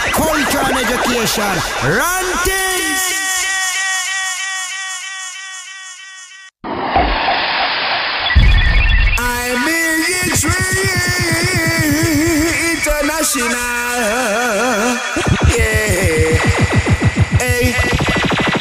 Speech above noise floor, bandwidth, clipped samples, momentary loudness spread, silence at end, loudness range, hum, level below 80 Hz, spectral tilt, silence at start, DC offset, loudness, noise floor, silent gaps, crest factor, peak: 21 dB; 16 kHz; under 0.1%; 8 LU; 0 s; 5 LU; none; -24 dBFS; -3.5 dB/octave; 0 s; under 0.1%; -14 LUFS; -37 dBFS; none; 14 dB; -2 dBFS